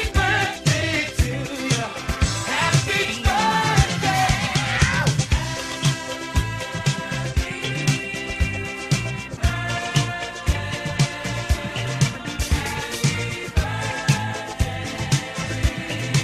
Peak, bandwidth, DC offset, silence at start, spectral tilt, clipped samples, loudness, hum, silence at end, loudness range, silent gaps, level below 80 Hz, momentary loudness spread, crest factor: -2 dBFS; 14 kHz; under 0.1%; 0 s; -4 dB/octave; under 0.1%; -22 LUFS; none; 0 s; 4 LU; none; -30 dBFS; 7 LU; 20 dB